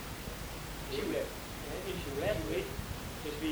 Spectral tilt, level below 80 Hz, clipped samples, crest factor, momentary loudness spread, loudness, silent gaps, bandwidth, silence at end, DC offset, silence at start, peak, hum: -4.5 dB/octave; -48 dBFS; under 0.1%; 18 dB; 7 LU; -38 LUFS; none; over 20 kHz; 0 s; under 0.1%; 0 s; -20 dBFS; none